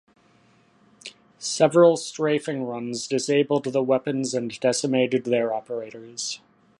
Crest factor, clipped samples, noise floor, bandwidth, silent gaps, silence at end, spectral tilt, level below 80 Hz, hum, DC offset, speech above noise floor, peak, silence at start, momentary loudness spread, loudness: 20 dB; under 0.1%; -59 dBFS; 11.5 kHz; none; 0.4 s; -4.5 dB/octave; -74 dBFS; none; under 0.1%; 36 dB; -4 dBFS; 1.05 s; 16 LU; -23 LUFS